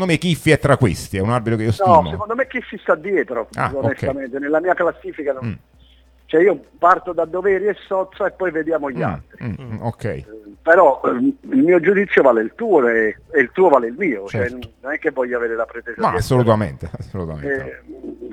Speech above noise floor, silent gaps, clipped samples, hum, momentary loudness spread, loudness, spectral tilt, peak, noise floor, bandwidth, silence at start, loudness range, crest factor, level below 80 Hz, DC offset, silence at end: 32 dB; none; under 0.1%; none; 14 LU; -18 LUFS; -7 dB/octave; 0 dBFS; -50 dBFS; 15.5 kHz; 0 s; 6 LU; 18 dB; -46 dBFS; under 0.1%; 0 s